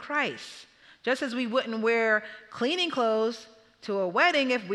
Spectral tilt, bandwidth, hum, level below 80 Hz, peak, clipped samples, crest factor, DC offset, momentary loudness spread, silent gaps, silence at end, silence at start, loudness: -3.5 dB/octave; 12 kHz; none; -76 dBFS; -8 dBFS; under 0.1%; 20 dB; under 0.1%; 19 LU; none; 0 s; 0 s; -27 LUFS